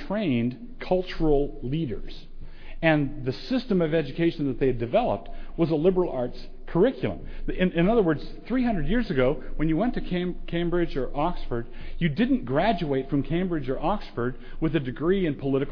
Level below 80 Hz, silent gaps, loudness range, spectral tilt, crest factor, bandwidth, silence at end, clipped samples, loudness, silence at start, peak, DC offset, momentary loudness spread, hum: -34 dBFS; none; 2 LU; -9 dB/octave; 18 dB; 5.4 kHz; 0 s; under 0.1%; -26 LUFS; 0 s; -8 dBFS; under 0.1%; 10 LU; none